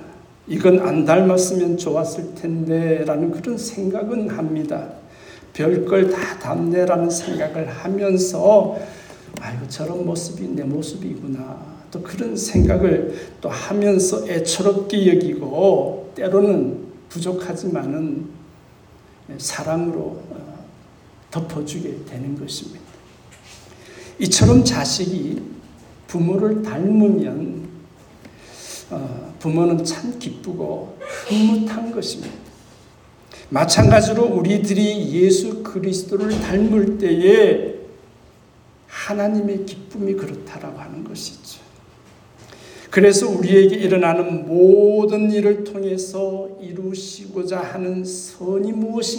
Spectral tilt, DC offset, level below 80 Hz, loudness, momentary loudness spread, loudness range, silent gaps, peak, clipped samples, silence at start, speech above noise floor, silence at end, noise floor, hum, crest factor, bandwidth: -5.5 dB/octave; under 0.1%; -42 dBFS; -19 LUFS; 18 LU; 11 LU; none; 0 dBFS; under 0.1%; 0 s; 31 dB; 0 s; -49 dBFS; none; 18 dB; 19.5 kHz